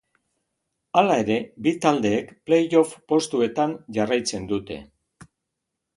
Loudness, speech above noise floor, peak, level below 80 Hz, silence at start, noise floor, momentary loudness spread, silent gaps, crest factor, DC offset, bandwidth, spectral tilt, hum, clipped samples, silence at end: -23 LUFS; 60 dB; -2 dBFS; -58 dBFS; 0.95 s; -82 dBFS; 9 LU; none; 22 dB; under 0.1%; 11.5 kHz; -5 dB/octave; none; under 0.1%; 1.15 s